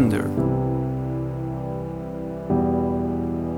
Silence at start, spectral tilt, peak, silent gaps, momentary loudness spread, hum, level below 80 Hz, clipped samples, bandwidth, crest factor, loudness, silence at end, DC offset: 0 s; -9 dB/octave; -6 dBFS; none; 9 LU; none; -40 dBFS; under 0.1%; 13 kHz; 16 dB; -25 LUFS; 0 s; under 0.1%